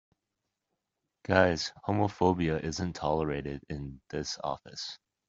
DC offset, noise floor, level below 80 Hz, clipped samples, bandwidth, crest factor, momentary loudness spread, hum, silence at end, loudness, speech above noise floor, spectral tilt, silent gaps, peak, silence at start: under 0.1%; -85 dBFS; -54 dBFS; under 0.1%; 8 kHz; 26 dB; 14 LU; none; 0.35 s; -31 LUFS; 55 dB; -5.5 dB/octave; none; -6 dBFS; 1.3 s